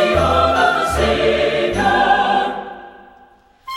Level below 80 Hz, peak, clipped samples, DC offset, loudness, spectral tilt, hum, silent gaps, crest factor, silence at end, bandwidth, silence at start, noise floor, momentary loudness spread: -34 dBFS; -2 dBFS; under 0.1%; under 0.1%; -15 LUFS; -4.5 dB/octave; none; none; 16 dB; 0 s; 16 kHz; 0 s; -49 dBFS; 11 LU